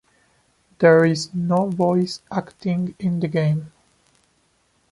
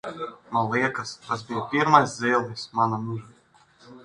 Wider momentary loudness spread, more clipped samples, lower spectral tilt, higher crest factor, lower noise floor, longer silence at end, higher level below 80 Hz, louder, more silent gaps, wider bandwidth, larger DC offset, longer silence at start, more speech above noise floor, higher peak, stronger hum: second, 12 LU vs 15 LU; neither; first, -7 dB/octave vs -5 dB/octave; second, 18 dB vs 24 dB; first, -64 dBFS vs -58 dBFS; first, 1.25 s vs 0 s; about the same, -62 dBFS vs -64 dBFS; first, -20 LUFS vs -24 LUFS; neither; about the same, 11.5 kHz vs 11 kHz; neither; first, 0.8 s vs 0.05 s; first, 45 dB vs 33 dB; about the same, -2 dBFS vs -2 dBFS; neither